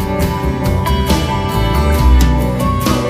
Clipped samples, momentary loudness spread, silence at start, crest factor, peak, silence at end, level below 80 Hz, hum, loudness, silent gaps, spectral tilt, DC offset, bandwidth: under 0.1%; 5 LU; 0 s; 12 dB; 0 dBFS; 0 s; -16 dBFS; none; -14 LUFS; none; -6 dB/octave; 0.2%; 15.5 kHz